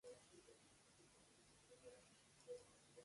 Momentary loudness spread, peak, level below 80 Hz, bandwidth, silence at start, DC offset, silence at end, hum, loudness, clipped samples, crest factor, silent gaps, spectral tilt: 9 LU; -46 dBFS; -88 dBFS; 11.5 kHz; 0.05 s; under 0.1%; 0 s; none; -64 LUFS; under 0.1%; 20 dB; none; -3 dB/octave